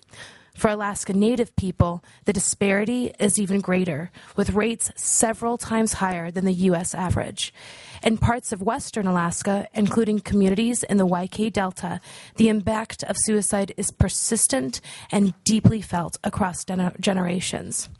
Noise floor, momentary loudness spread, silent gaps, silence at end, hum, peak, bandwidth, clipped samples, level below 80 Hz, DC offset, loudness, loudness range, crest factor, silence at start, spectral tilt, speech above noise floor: -45 dBFS; 8 LU; none; 0.05 s; none; -2 dBFS; 11.5 kHz; under 0.1%; -44 dBFS; under 0.1%; -23 LUFS; 2 LU; 22 dB; 0.15 s; -4.5 dB/octave; 23 dB